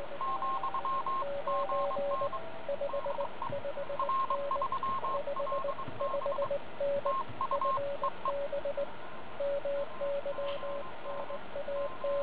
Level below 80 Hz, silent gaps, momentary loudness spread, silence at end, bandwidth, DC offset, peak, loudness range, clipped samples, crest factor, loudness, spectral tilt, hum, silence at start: -64 dBFS; none; 7 LU; 0 s; 4 kHz; 1%; -20 dBFS; 3 LU; under 0.1%; 14 dB; -35 LUFS; -3 dB/octave; none; 0 s